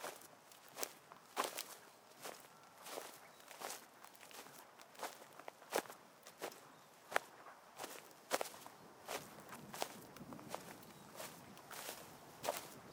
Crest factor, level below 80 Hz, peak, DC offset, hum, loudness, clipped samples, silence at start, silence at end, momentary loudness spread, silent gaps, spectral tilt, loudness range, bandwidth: 36 dB; -88 dBFS; -14 dBFS; under 0.1%; none; -49 LUFS; under 0.1%; 0 s; 0 s; 15 LU; none; -2 dB/octave; 6 LU; 18 kHz